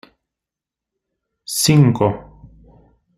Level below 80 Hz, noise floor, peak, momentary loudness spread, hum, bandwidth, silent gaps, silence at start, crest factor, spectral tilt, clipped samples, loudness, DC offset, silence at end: -50 dBFS; -86 dBFS; -2 dBFS; 19 LU; none; 15.5 kHz; none; 1.5 s; 18 dB; -5 dB/octave; under 0.1%; -15 LUFS; under 0.1%; 0.95 s